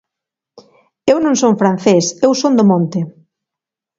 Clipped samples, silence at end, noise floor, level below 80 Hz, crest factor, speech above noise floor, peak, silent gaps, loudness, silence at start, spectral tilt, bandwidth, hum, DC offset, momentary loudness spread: under 0.1%; 0.9 s; -85 dBFS; -58 dBFS; 16 dB; 72 dB; 0 dBFS; none; -13 LUFS; 1.05 s; -5.5 dB/octave; 7.8 kHz; none; under 0.1%; 9 LU